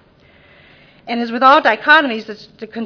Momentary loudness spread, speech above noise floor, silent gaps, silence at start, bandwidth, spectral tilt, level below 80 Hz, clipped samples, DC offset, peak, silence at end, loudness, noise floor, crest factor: 21 LU; 35 dB; none; 1.05 s; 5.4 kHz; -4 dB/octave; -60 dBFS; 0.2%; under 0.1%; 0 dBFS; 0 s; -13 LUFS; -49 dBFS; 16 dB